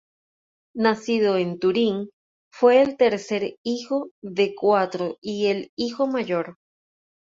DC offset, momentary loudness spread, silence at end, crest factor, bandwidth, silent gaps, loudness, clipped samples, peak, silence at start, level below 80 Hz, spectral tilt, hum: under 0.1%; 11 LU; 0.75 s; 18 dB; 7.8 kHz; 2.13-2.51 s, 3.58-3.64 s, 4.11-4.22 s, 5.18-5.22 s, 5.69-5.77 s; -23 LUFS; under 0.1%; -4 dBFS; 0.75 s; -68 dBFS; -5.5 dB/octave; none